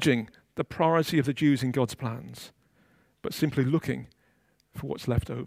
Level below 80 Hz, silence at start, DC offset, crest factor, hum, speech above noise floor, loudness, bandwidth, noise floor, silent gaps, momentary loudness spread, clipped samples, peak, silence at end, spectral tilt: -52 dBFS; 0 s; under 0.1%; 20 dB; none; 41 dB; -28 LUFS; 16 kHz; -68 dBFS; none; 16 LU; under 0.1%; -10 dBFS; 0 s; -6.5 dB/octave